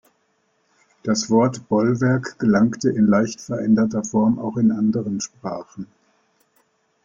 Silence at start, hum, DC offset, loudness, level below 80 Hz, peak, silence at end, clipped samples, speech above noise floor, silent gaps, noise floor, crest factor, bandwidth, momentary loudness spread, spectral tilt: 1.05 s; none; under 0.1%; -20 LUFS; -58 dBFS; -4 dBFS; 1.2 s; under 0.1%; 47 dB; none; -66 dBFS; 16 dB; 7.6 kHz; 13 LU; -6 dB/octave